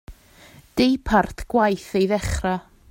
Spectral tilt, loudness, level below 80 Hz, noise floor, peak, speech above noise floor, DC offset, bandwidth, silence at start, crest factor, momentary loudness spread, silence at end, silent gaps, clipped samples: -5.5 dB/octave; -22 LUFS; -38 dBFS; -49 dBFS; -4 dBFS; 28 dB; under 0.1%; 16.5 kHz; 0.1 s; 18 dB; 7 LU; 0.3 s; none; under 0.1%